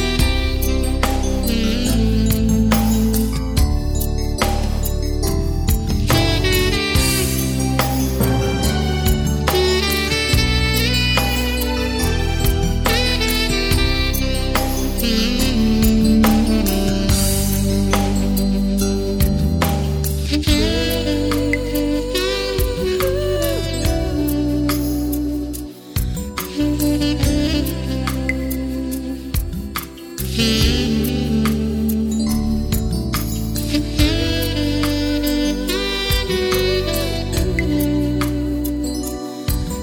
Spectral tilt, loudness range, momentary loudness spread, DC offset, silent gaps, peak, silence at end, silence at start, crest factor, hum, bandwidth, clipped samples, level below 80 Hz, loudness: -5 dB/octave; 4 LU; 6 LU; under 0.1%; none; -4 dBFS; 0 s; 0 s; 14 dB; none; over 20 kHz; under 0.1%; -22 dBFS; -19 LUFS